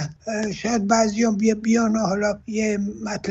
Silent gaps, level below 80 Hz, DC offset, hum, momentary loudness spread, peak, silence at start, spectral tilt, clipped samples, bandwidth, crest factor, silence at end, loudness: none; -52 dBFS; under 0.1%; none; 8 LU; -6 dBFS; 0 s; -5 dB/octave; under 0.1%; 8.2 kHz; 16 dB; 0 s; -22 LUFS